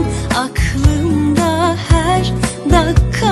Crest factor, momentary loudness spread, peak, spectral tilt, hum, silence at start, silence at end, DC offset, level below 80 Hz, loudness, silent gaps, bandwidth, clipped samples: 14 dB; 5 LU; 0 dBFS; -5.5 dB/octave; none; 0 s; 0 s; under 0.1%; -20 dBFS; -14 LUFS; none; 12.5 kHz; under 0.1%